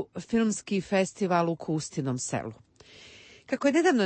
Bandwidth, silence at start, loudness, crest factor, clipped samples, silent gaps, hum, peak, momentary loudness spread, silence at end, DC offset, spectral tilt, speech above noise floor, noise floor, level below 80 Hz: 8.8 kHz; 0 s; -28 LUFS; 16 dB; under 0.1%; none; none; -12 dBFS; 16 LU; 0 s; under 0.1%; -5 dB/octave; 25 dB; -52 dBFS; -64 dBFS